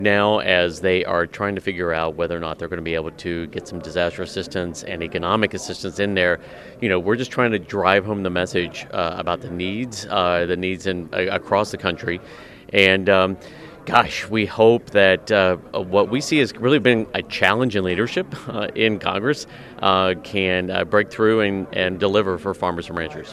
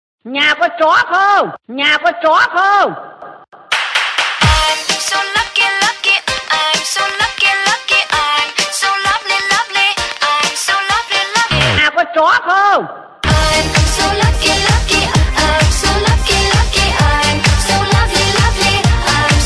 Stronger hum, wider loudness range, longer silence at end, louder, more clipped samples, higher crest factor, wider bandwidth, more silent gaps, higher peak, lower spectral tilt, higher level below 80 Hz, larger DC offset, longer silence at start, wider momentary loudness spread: neither; first, 7 LU vs 1 LU; about the same, 0 s vs 0 s; second, -20 LUFS vs -12 LUFS; neither; first, 20 dB vs 12 dB; first, 13.5 kHz vs 11 kHz; neither; about the same, 0 dBFS vs 0 dBFS; first, -5 dB/octave vs -3 dB/octave; second, -50 dBFS vs -22 dBFS; neither; second, 0 s vs 0.25 s; first, 11 LU vs 4 LU